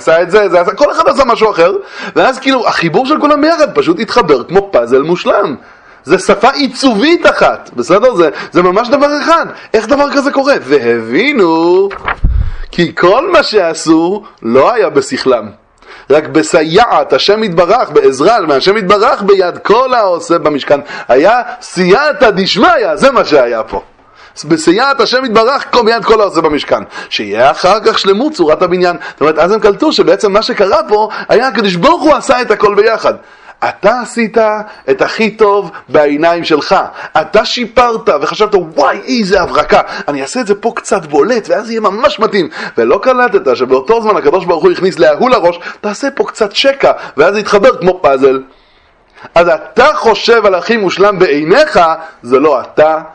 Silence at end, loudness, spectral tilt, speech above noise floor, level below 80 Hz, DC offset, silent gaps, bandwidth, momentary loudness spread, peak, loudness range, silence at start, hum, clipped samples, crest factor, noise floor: 0.05 s; -9 LUFS; -4.5 dB/octave; 38 dB; -32 dBFS; under 0.1%; none; 10.5 kHz; 7 LU; 0 dBFS; 2 LU; 0 s; none; 0.6%; 10 dB; -47 dBFS